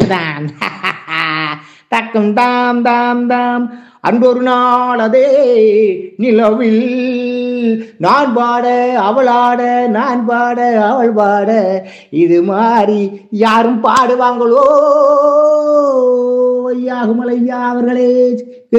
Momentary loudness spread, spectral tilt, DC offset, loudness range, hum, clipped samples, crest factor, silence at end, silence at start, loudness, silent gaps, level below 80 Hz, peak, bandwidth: 8 LU; -6.5 dB/octave; under 0.1%; 3 LU; none; 0.2%; 12 dB; 0 s; 0 s; -12 LUFS; none; -60 dBFS; 0 dBFS; 8.8 kHz